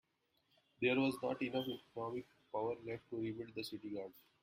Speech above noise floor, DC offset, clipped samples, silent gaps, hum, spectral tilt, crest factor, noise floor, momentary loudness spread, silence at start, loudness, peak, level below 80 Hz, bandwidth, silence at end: 39 dB; under 0.1%; under 0.1%; none; none; -6 dB/octave; 18 dB; -81 dBFS; 11 LU; 0.8 s; -41 LUFS; -24 dBFS; -78 dBFS; 16 kHz; 0.2 s